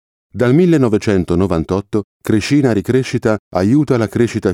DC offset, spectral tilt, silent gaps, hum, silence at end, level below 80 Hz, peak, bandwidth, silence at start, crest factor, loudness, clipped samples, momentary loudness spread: under 0.1%; -7 dB/octave; 2.04-2.20 s, 3.39-3.51 s; none; 0 s; -44 dBFS; 0 dBFS; 15 kHz; 0.35 s; 14 dB; -15 LUFS; under 0.1%; 6 LU